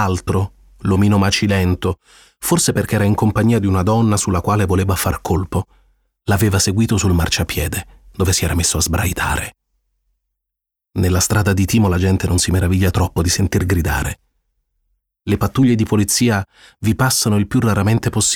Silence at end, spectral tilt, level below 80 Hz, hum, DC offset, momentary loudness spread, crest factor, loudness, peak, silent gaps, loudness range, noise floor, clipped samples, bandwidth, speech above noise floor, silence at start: 0 s; -5 dB/octave; -32 dBFS; none; 0.3%; 9 LU; 14 dB; -17 LUFS; -2 dBFS; none; 3 LU; -83 dBFS; under 0.1%; 18.5 kHz; 67 dB; 0 s